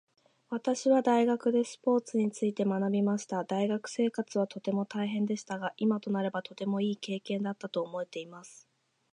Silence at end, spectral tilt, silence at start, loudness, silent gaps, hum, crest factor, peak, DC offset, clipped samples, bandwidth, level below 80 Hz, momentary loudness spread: 0.6 s; -6 dB/octave; 0.5 s; -31 LUFS; none; none; 16 dB; -14 dBFS; under 0.1%; under 0.1%; 10.5 kHz; -82 dBFS; 10 LU